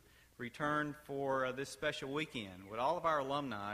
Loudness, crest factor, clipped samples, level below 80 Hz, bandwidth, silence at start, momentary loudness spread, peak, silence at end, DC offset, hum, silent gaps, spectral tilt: -38 LUFS; 18 dB; under 0.1%; -68 dBFS; 15 kHz; 0.4 s; 10 LU; -22 dBFS; 0 s; under 0.1%; none; none; -5 dB/octave